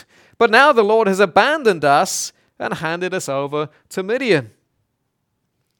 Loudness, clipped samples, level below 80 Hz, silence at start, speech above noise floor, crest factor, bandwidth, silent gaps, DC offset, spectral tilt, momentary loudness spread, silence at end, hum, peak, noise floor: -16 LUFS; under 0.1%; -64 dBFS; 0.4 s; 55 dB; 18 dB; 19 kHz; none; under 0.1%; -3.5 dB/octave; 14 LU; 1.3 s; none; 0 dBFS; -71 dBFS